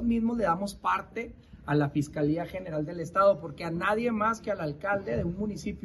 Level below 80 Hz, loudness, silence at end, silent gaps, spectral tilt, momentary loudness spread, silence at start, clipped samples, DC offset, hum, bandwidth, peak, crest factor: -50 dBFS; -29 LUFS; 0.05 s; none; -7 dB/octave; 9 LU; 0 s; under 0.1%; under 0.1%; none; 12.5 kHz; -12 dBFS; 16 dB